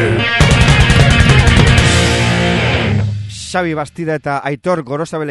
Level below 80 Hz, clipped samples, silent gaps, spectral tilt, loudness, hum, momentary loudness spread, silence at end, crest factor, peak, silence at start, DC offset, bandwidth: -20 dBFS; 0.3%; none; -5 dB/octave; -12 LUFS; none; 11 LU; 0 s; 12 dB; 0 dBFS; 0 s; under 0.1%; 12 kHz